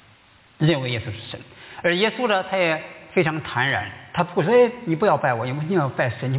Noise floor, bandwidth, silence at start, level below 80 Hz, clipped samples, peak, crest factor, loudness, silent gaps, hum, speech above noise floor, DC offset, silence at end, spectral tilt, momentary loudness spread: -54 dBFS; 4 kHz; 0.6 s; -56 dBFS; under 0.1%; -6 dBFS; 16 dB; -22 LUFS; none; none; 32 dB; under 0.1%; 0 s; -10 dB/octave; 10 LU